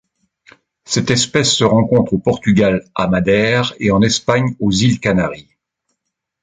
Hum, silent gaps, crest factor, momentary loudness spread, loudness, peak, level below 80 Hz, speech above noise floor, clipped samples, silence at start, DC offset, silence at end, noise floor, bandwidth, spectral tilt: none; none; 14 dB; 6 LU; -15 LUFS; 0 dBFS; -42 dBFS; 61 dB; under 0.1%; 0.9 s; under 0.1%; 1 s; -76 dBFS; 9.6 kHz; -5 dB/octave